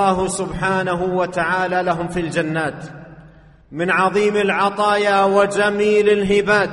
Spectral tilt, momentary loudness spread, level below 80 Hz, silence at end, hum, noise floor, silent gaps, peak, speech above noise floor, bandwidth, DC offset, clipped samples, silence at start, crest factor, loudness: -5 dB/octave; 7 LU; -46 dBFS; 0 s; none; -45 dBFS; none; -2 dBFS; 28 dB; 11.5 kHz; under 0.1%; under 0.1%; 0 s; 16 dB; -18 LUFS